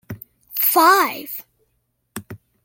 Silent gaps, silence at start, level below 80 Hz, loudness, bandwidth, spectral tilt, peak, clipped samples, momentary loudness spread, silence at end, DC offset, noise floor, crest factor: none; 0.1 s; -64 dBFS; -16 LUFS; 17 kHz; -2.5 dB/octave; -2 dBFS; under 0.1%; 24 LU; 0.3 s; under 0.1%; -70 dBFS; 20 dB